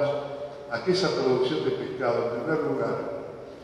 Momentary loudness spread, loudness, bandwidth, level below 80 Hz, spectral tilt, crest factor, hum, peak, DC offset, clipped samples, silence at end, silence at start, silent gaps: 12 LU; -27 LUFS; 10.5 kHz; -62 dBFS; -6 dB/octave; 16 dB; none; -12 dBFS; under 0.1%; under 0.1%; 0 s; 0 s; none